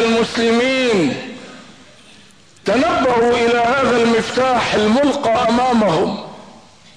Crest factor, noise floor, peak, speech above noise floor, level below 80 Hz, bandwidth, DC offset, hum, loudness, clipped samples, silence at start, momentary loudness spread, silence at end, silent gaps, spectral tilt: 10 dB; -46 dBFS; -6 dBFS; 31 dB; -46 dBFS; 10.5 kHz; 0.3%; none; -15 LUFS; under 0.1%; 0 s; 11 LU; 0.5 s; none; -4.5 dB/octave